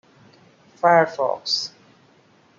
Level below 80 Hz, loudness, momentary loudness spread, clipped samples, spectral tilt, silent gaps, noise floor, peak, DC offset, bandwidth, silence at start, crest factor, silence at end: -80 dBFS; -20 LUFS; 8 LU; under 0.1%; -3.5 dB/octave; none; -56 dBFS; -4 dBFS; under 0.1%; 7.6 kHz; 0.85 s; 20 dB; 0.9 s